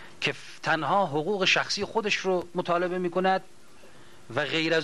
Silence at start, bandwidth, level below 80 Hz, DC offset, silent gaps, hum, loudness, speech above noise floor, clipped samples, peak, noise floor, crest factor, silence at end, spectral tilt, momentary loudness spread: 0 s; 12 kHz; -70 dBFS; 0.5%; none; none; -26 LUFS; 27 dB; under 0.1%; -10 dBFS; -53 dBFS; 16 dB; 0 s; -4 dB/octave; 7 LU